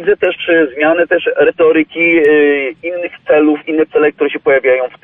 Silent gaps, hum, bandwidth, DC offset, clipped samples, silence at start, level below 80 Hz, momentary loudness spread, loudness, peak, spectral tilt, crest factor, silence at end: none; none; 3.8 kHz; under 0.1%; under 0.1%; 0 s; -54 dBFS; 6 LU; -12 LUFS; -2 dBFS; -7.5 dB/octave; 10 dB; 0.15 s